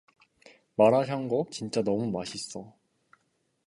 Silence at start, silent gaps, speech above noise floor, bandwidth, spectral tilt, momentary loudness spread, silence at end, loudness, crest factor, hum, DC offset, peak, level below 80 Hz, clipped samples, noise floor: 0.8 s; none; 47 dB; 11.5 kHz; -5.5 dB/octave; 15 LU; 1 s; -28 LUFS; 22 dB; none; under 0.1%; -8 dBFS; -68 dBFS; under 0.1%; -74 dBFS